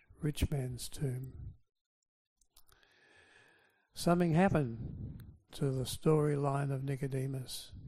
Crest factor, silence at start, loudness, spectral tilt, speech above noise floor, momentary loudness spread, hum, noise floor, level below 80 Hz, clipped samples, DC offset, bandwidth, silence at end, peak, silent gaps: 20 dB; 0.2 s; -35 LUFS; -6.5 dB/octave; 35 dB; 18 LU; none; -69 dBFS; -52 dBFS; under 0.1%; under 0.1%; 15 kHz; 0 s; -16 dBFS; 1.81-2.02 s, 2.08-2.36 s